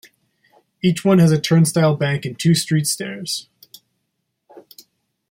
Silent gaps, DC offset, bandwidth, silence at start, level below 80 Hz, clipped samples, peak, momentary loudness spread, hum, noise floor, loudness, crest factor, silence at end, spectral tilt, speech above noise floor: none; under 0.1%; 16.5 kHz; 0.85 s; -58 dBFS; under 0.1%; -4 dBFS; 10 LU; none; -74 dBFS; -18 LUFS; 16 dB; 0.7 s; -5.5 dB/octave; 57 dB